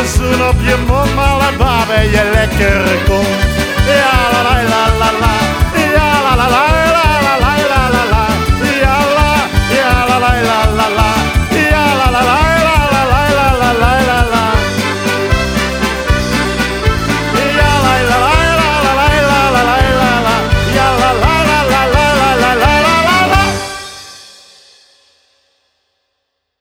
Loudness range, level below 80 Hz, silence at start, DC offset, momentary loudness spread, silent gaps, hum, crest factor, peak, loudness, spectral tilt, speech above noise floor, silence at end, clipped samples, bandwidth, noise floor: 3 LU; -20 dBFS; 0 s; under 0.1%; 4 LU; none; none; 10 dB; 0 dBFS; -11 LUFS; -4.5 dB/octave; 59 dB; 2.4 s; under 0.1%; 18 kHz; -69 dBFS